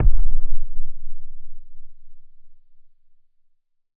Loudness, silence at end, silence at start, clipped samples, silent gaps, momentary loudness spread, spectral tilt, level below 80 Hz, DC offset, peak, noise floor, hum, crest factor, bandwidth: -31 LUFS; 1.45 s; 0 s; under 0.1%; none; 24 LU; -12.5 dB/octave; -24 dBFS; under 0.1%; -2 dBFS; -60 dBFS; none; 14 dB; 0.4 kHz